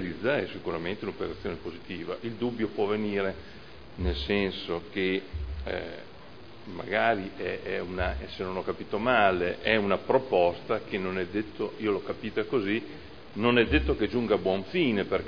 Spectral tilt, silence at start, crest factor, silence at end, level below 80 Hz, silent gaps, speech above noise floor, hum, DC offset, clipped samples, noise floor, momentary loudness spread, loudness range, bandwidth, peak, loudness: -7.5 dB/octave; 0 s; 22 dB; 0 s; -44 dBFS; none; 20 dB; none; 0.4%; under 0.1%; -48 dBFS; 14 LU; 6 LU; 5.4 kHz; -6 dBFS; -29 LUFS